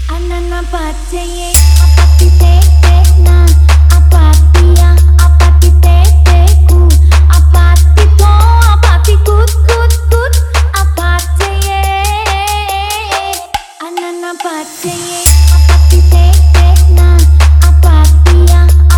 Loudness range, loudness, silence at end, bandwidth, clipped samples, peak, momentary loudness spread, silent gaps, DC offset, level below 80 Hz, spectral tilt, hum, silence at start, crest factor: 7 LU; -7 LUFS; 0 s; 18.5 kHz; 2%; 0 dBFS; 12 LU; none; under 0.1%; -6 dBFS; -5 dB/octave; none; 0 s; 6 dB